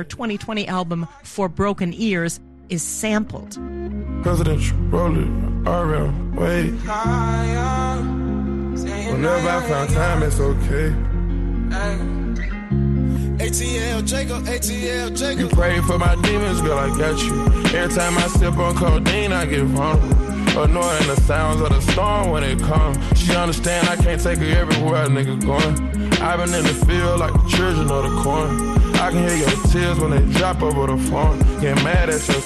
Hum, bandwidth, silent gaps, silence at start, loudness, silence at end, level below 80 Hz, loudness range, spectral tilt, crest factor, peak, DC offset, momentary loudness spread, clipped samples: none; 12.5 kHz; none; 0 s; -19 LUFS; 0 s; -24 dBFS; 4 LU; -5 dB/octave; 12 dB; -6 dBFS; under 0.1%; 7 LU; under 0.1%